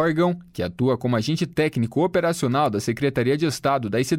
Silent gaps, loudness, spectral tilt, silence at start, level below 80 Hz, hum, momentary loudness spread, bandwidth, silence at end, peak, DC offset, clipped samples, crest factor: none; -23 LUFS; -6 dB/octave; 0 s; -54 dBFS; none; 3 LU; 16.5 kHz; 0 s; -8 dBFS; under 0.1%; under 0.1%; 12 dB